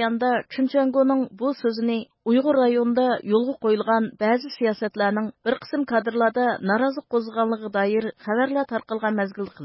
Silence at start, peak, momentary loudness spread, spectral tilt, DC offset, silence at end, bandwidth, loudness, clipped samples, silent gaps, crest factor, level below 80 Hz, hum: 0 s; -8 dBFS; 6 LU; -10 dB/octave; under 0.1%; 0 s; 5.8 kHz; -23 LUFS; under 0.1%; none; 14 dB; -70 dBFS; none